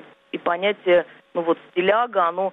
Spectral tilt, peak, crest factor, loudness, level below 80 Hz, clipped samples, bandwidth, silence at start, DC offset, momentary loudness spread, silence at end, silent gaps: -7.5 dB/octave; -8 dBFS; 14 dB; -22 LUFS; -68 dBFS; under 0.1%; 4 kHz; 0.35 s; under 0.1%; 9 LU; 0 s; none